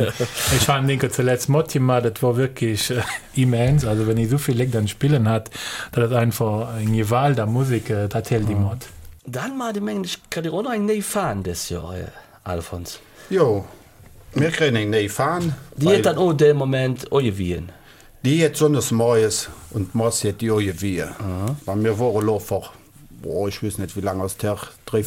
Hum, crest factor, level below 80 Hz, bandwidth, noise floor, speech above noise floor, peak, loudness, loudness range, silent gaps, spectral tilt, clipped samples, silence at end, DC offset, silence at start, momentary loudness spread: none; 16 dB; -44 dBFS; 17 kHz; -46 dBFS; 25 dB; -4 dBFS; -21 LUFS; 6 LU; none; -5.5 dB/octave; under 0.1%; 0 s; under 0.1%; 0 s; 12 LU